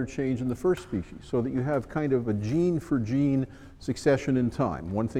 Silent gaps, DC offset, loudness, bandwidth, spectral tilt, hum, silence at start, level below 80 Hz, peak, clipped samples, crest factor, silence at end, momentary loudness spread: none; under 0.1%; -28 LUFS; 12 kHz; -7.5 dB/octave; none; 0 s; -50 dBFS; -10 dBFS; under 0.1%; 16 dB; 0 s; 7 LU